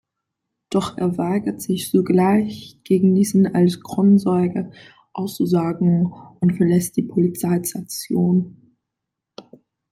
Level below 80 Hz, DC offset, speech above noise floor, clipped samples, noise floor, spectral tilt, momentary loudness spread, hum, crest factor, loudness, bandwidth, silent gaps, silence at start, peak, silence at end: -58 dBFS; under 0.1%; 64 dB; under 0.1%; -82 dBFS; -7 dB/octave; 12 LU; none; 14 dB; -19 LUFS; 16 kHz; none; 0.7 s; -6 dBFS; 0.5 s